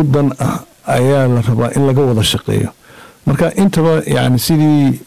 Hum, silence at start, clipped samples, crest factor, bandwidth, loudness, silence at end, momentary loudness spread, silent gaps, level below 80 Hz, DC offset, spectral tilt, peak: none; 0 s; under 0.1%; 8 dB; 16 kHz; -13 LUFS; 0 s; 7 LU; none; -38 dBFS; 1%; -6 dB/octave; -6 dBFS